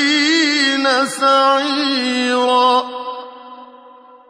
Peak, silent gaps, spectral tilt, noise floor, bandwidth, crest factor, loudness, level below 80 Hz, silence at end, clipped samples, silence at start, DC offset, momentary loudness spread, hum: -2 dBFS; none; -1 dB/octave; -43 dBFS; 11 kHz; 14 dB; -14 LUFS; -70 dBFS; 0.55 s; under 0.1%; 0 s; under 0.1%; 14 LU; none